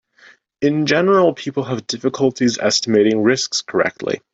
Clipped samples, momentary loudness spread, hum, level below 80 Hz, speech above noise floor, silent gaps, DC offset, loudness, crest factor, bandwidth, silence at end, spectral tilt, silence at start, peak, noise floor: under 0.1%; 9 LU; none; -60 dBFS; 33 dB; none; under 0.1%; -17 LUFS; 14 dB; 8 kHz; 0.15 s; -4 dB/octave; 0.6 s; -2 dBFS; -50 dBFS